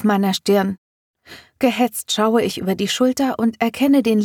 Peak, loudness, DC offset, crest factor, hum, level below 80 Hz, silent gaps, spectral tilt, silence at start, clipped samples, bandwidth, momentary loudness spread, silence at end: -2 dBFS; -18 LUFS; under 0.1%; 16 dB; none; -60 dBFS; 0.78-1.14 s; -4.5 dB/octave; 0 s; under 0.1%; 18.5 kHz; 5 LU; 0 s